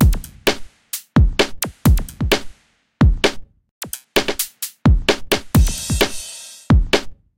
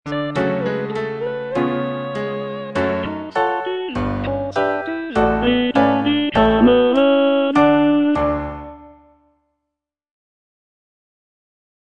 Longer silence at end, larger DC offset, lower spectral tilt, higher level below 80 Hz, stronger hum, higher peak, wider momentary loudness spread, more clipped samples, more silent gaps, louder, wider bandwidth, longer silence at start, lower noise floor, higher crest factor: second, 0.25 s vs 3.05 s; neither; second, -5 dB/octave vs -7 dB/octave; first, -22 dBFS vs -40 dBFS; neither; about the same, 0 dBFS vs -2 dBFS; first, 14 LU vs 11 LU; neither; first, 3.71-3.81 s vs none; about the same, -18 LUFS vs -18 LUFS; first, 17 kHz vs 8.8 kHz; about the same, 0 s vs 0.05 s; second, -53 dBFS vs -81 dBFS; about the same, 18 dB vs 18 dB